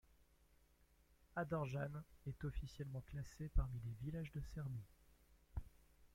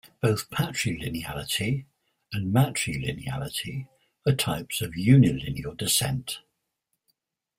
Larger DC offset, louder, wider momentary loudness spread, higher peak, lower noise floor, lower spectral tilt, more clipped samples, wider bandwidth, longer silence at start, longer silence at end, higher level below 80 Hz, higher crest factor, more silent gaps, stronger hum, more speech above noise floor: neither; second, -49 LUFS vs -26 LUFS; about the same, 11 LU vs 13 LU; second, -28 dBFS vs -6 dBFS; second, -73 dBFS vs -80 dBFS; first, -7.5 dB/octave vs -5 dB/octave; neither; about the same, 16.5 kHz vs 16 kHz; about the same, 0.2 s vs 0.25 s; second, 0.1 s vs 1.2 s; about the same, -52 dBFS vs -52 dBFS; about the same, 20 dB vs 22 dB; neither; neither; second, 28 dB vs 54 dB